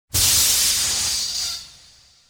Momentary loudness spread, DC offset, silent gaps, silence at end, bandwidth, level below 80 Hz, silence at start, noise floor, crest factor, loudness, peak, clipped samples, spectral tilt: 11 LU; under 0.1%; none; 0.6 s; over 20 kHz; -42 dBFS; 0.15 s; -51 dBFS; 16 dB; -17 LUFS; -6 dBFS; under 0.1%; 0.5 dB/octave